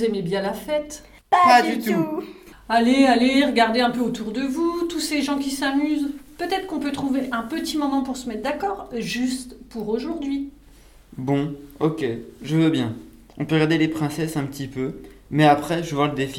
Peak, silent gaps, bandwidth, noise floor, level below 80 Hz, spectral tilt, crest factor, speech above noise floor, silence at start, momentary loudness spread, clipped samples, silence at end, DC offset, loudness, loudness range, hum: -2 dBFS; none; 17 kHz; -49 dBFS; -50 dBFS; -5.5 dB/octave; 20 dB; 27 dB; 0 s; 14 LU; under 0.1%; 0 s; under 0.1%; -22 LUFS; 8 LU; none